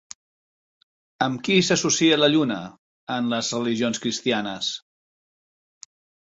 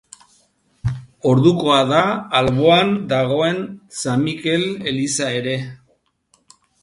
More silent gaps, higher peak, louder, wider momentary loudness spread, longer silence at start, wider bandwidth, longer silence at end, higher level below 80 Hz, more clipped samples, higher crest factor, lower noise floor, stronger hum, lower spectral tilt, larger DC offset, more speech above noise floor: first, 2.79-3.07 s vs none; second, -4 dBFS vs 0 dBFS; second, -22 LUFS vs -18 LUFS; about the same, 13 LU vs 13 LU; first, 1.2 s vs 0.85 s; second, 8 kHz vs 11.5 kHz; first, 1.45 s vs 1.1 s; second, -64 dBFS vs -48 dBFS; neither; about the same, 20 dB vs 18 dB; first, under -90 dBFS vs -63 dBFS; neither; second, -3.5 dB/octave vs -5 dB/octave; neither; first, over 68 dB vs 45 dB